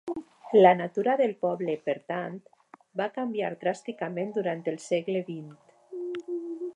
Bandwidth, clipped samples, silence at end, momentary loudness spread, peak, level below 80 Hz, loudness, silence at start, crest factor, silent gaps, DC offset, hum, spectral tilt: 10.5 kHz; under 0.1%; 0.05 s; 18 LU; -6 dBFS; -78 dBFS; -28 LUFS; 0.05 s; 22 dB; none; under 0.1%; none; -6.5 dB/octave